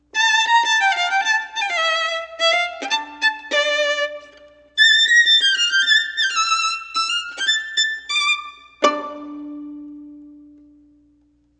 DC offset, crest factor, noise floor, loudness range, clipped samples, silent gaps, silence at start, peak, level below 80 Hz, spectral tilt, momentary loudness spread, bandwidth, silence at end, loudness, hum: under 0.1%; 20 dB; -59 dBFS; 8 LU; under 0.1%; none; 0.15 s; 0 dBFS; -66 dBFS; 2 dB/octave; 20 LU; 9.8 kHz; 1.2 s; -17 LUFS; none